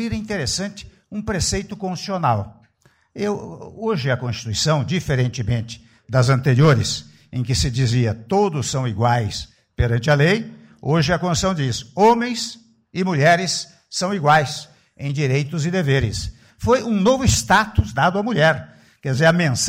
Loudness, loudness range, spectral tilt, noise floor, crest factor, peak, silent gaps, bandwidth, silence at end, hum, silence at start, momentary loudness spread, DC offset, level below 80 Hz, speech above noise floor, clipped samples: -20 LUFS; 5 LU; -5 dB/octave; -59 dBFS; 14 dB; -6 dBFS; none; 16 kHz; 0 s; none; 0 s; 13 LU; under 0.1%; -38 dBFS; 40 dB; under 0.1%